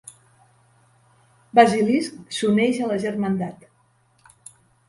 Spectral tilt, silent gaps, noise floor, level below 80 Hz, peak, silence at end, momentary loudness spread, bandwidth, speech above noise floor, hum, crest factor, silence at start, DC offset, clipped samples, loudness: -5.5 dB/octave; none; -62 dBFS; -64 dBFS; 0 dBFS; 1.35 s; 11 LU; 11.5 kHz; 42 dB; none; 22 dB; 1.55 s; under 0.1%; under 0.1%; -21 LUFS